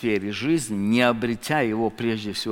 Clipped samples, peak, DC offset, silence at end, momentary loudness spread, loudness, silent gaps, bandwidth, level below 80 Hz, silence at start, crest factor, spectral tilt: under 0.1%; -4 dBFS; under 0.1%; 0 s; 6 LU; -23 LUFS; none; 17 kHz; -54 dBFS; 0 s; 20 dB; -5 dB/octave